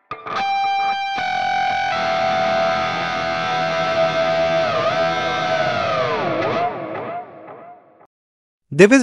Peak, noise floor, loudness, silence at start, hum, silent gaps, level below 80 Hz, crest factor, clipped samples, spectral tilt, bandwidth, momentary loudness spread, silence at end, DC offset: 0 dBFS; -42 dBFS; -19 LUFS; 0.1 s; none; 8.06-8.58 s; -56 dBFS; 20 dB; under 0.1%; -4.5 dB/octave; 11 kHz; 10 LU; 0 s; 0.4%